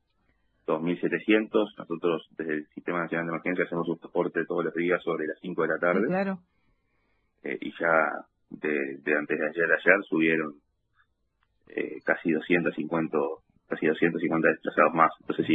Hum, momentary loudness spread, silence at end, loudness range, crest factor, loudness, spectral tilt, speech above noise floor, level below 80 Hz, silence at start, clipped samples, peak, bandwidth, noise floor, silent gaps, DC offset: none; 11 LU; 0 s; 4 LU; 24 dB; -27 LUFS; -9 dB/octave; 46 dB; -72 dBFS; 0.7 s; under 0.1%; -4 dBFS; 4.3 kHz; -73 dBFS; none; under 0.1%